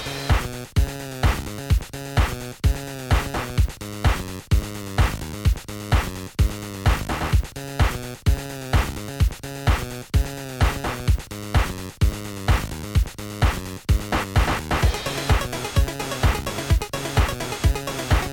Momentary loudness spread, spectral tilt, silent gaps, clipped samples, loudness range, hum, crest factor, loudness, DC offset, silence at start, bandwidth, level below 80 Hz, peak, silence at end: 4 LU; -5 dB/octave; none; under 0.1%; 2 LU; none; 16 dB; -24 LUFS; under 0.1%; 0 s; 17 kHz; -26 dBFS; -6 dBFS; 0 s